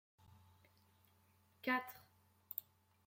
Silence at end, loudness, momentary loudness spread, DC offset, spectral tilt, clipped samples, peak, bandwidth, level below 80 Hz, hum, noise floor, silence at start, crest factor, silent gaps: 0.45 s; -44 LUFS; 15 LU; under 0.1%; -4.5 dB/octave; under 0.1%; -24 dBFS; 16.5 kHz; -88 dBFS; none; -73 dBFS; 1.65 s; 26 dB; none